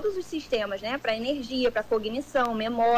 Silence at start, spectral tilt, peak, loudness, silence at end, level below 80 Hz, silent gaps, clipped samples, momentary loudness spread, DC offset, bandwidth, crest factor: 0 s; -4.5 dB/octave; -16 dBFS; -28 LUFS; 0 s; -54 dBFS; none; under 0.1%; 4 LU; under 0.1%; 16 kHz; 12 dB